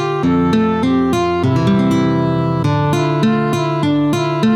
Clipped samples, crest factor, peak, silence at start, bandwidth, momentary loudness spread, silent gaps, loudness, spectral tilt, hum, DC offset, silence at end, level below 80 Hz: under 0.1%; 10 dB; -4 dBFS; 0 s; 14.5 kHz; 2 LU; none; -15 LUFS; -7 dB/octave; none; under 0.1%; 0 s; -44 dBFS